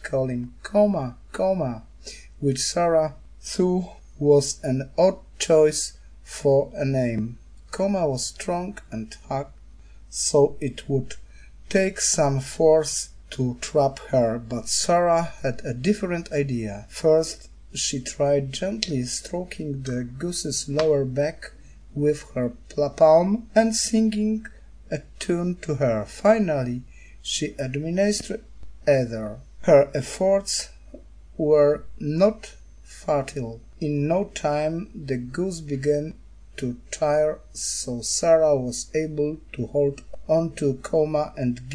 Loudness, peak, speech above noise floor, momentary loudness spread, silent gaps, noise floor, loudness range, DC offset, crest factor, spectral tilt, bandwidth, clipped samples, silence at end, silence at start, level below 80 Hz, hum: -24 LUFS; -2 dBFS; 23 dB; 15 LU; none; -46 dBFS; 5 LU; 0.3%; 22 dB; -5 dB/octave; 10.5 kHz; under 0.1%; 0 s; 0 s; -46 dBFS; none